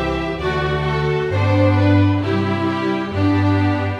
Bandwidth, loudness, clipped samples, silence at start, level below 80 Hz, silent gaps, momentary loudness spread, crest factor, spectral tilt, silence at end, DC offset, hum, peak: 7 kHz; -18 LUFS; under 0.1%; 0 s; -36 dBFS; none; 6 LU; 14 dB; -8 dB/octave; 0 s; under 0.1%; none; -4 dBFS